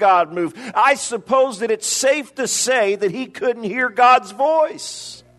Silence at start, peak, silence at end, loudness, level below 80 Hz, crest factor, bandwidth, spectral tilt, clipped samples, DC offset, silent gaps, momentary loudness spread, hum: 0 s; -2 dBFS; 0.2 s; -18 LUFS; -68 dBFS; 16 dB; 12.5 kHz; -2 dB/octave; under 0.1%; under 0.1%; none; 9 LU; none